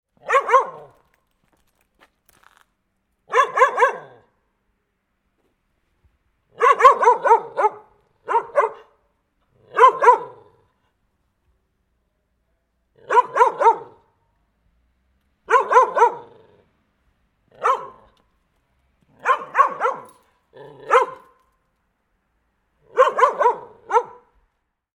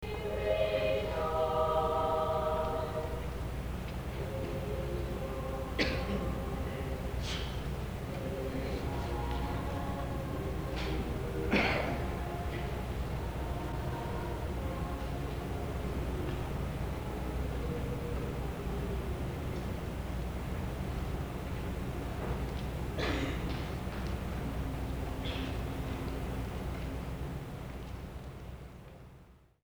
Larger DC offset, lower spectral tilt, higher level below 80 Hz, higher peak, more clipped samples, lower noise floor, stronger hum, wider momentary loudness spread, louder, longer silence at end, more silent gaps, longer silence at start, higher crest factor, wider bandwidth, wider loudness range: neither; second, -2.5 dB/octave vs -6.5 dB/octave; second, -68 dBFS vs -40 dBFS; first, 0 dBFS vs -14 dBFS; neither; first, -72 dBFS vs -58 dBFS; neither; first, 14 LU vs 8 LU; first, -18 LUFS vs -36 LUFS; first, 0.9 s vs 0.25 s; neither; first, 0.25 s vs 0 s; about the same, 22 dB vs 22 dB; second, 11 kHz vs over 20 kHz; about the same, 6 LU vs 5 LU